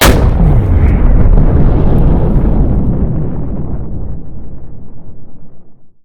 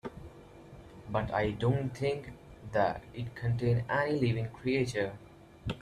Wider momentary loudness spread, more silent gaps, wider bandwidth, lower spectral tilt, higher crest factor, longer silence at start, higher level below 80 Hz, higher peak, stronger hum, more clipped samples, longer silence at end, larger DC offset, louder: about the same, 19 LU vs 21 LU; neither; first, 19 kHz vs 11.5 kHz; about the same, -6.5 dB/octave vs -7 dB/octave; second, 10 dB vs 18 dB; about the same, 0 s vs 0.05 s; first, -12 dBFS vs -54 dBFS; first, 0 dBFS vs -16 dBFS; neither; first, 0.6% vs under 0.1%; about the same, 0.1 s vs 0 s; neither; first, -12 LUFS vs -32 LUFS